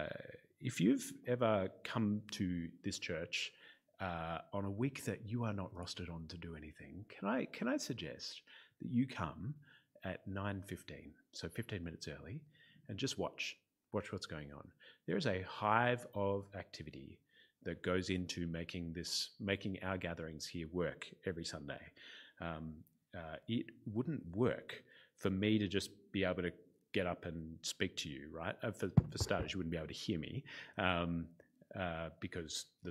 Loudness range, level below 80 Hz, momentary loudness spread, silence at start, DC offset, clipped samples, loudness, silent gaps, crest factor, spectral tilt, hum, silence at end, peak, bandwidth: 6 LU; -64 dBFS; 16 LU; 0 s; under 0.1%; under 0.1%; -41 LUFS; none; 26 dB; -5 dB/octave; none; 0 s; -14 dBFS; 15.5 kHz